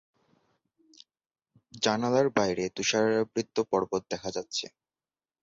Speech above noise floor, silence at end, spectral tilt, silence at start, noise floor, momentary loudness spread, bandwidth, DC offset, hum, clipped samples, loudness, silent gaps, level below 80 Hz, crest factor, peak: over 62 dB; 0.75 s; -4 dB/octave; 1.75 s; under -90 dBFS; 9 LU; 7.8 kHz; under 0.1%; none; under 0.1%; -28 LUFS; none; -66 dBFS; 20 dB; -12 dBFS